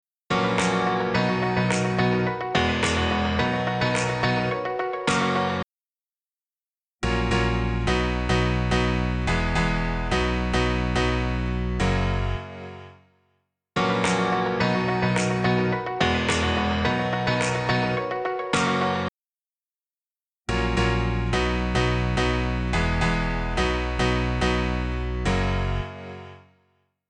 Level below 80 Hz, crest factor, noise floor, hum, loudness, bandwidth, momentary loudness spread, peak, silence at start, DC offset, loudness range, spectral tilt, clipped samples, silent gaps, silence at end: -32 dBFS; 18 dB; under -90 dBFS; none; -24 LUFS; 10 kHz; 5 LU; -6 dBFS; 0.3 s; under 0.1%; 4 LU; -5.5 dB/octave; under 0.1%; 5.85-5.90 s, 6.20-6.31 s, 6.51-6.55 s, 19.58-19.68 s, 19.80-19.84 s; 0.7 s